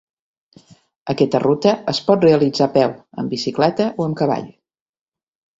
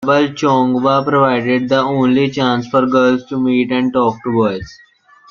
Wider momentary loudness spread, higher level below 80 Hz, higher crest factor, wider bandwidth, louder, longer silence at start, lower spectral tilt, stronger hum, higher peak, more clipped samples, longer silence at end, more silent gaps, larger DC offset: first, 11 LU vs 4 LU; second, -58 dBFS vs -52 dBFS; about the same, 18 dB vs 14 dB; first, 8 kHz vs 7.2 kHz; second, -18 LUFS vs -14 LUFS; first, 1.05 s vs 0 s; about the same, -6.5 dB/octave vs -6.5 dB/octave; neither; about the same, -2 dBFS vs -2 dBFS; neither; first, 1.1 s vs 0.55 s; neither; neither